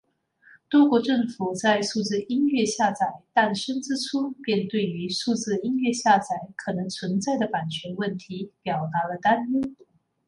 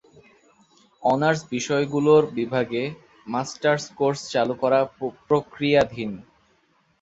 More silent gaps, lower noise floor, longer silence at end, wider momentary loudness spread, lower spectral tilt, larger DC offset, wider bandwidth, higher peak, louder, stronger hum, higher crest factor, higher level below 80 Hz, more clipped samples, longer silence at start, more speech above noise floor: neither; second, -58 dBFS vs -64 dBFS; second, 0.55 s vs 0.8 s; second, 9 LU vs 13 LU; about the same, -4.5 dB/octave vs -5.5 dB/octave; neither; first, 11.5 kHz vs 8 kHz; about the same, -4 dBFS vs -4 dBFS; about the same, -25 LUFS vs -23 LUFS; neither; about the same, 22 dB vs 20 dB; second, -68 dBFS vs -60 dBFS; neither; second, 0.7 s vs 1 s; second, 34 dB vs 42 dB